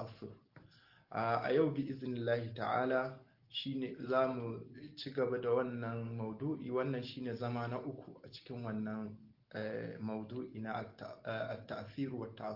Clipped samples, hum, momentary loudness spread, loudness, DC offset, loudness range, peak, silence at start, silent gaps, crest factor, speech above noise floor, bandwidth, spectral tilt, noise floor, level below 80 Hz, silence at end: under 0.1%; none; 15 LU; -39 LUFS; under 0.1%; 7 LU; -20 dBFS; 0 s; none; 18 dB; 26 dB; 5.8 kHz; -5 dB/octave; -65 dBFS; -76 dBFS; 0 s